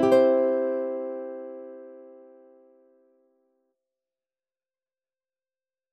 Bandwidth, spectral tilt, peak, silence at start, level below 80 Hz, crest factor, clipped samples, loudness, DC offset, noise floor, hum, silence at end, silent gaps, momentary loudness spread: 9 kHz; -6.5 dB/octave; -10 dBFS; 0 s; -76 dBFS; 20 dB; under 0.1%; -25 LUFS; under 0.1%; under -90 dBFS; none; 3.85 s; none; 25 LU